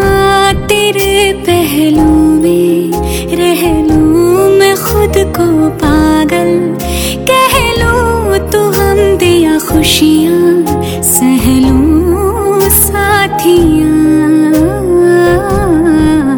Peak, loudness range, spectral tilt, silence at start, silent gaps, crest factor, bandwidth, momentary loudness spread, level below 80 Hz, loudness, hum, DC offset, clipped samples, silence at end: 0 dBFS; 2 LU; -4.5 dB/octave; 0 s; none; 8 dB; over 20 kHz; 4 LU; -22 dBFS; -8 LUFS; none; under 0.1%; 0.2%; 0 s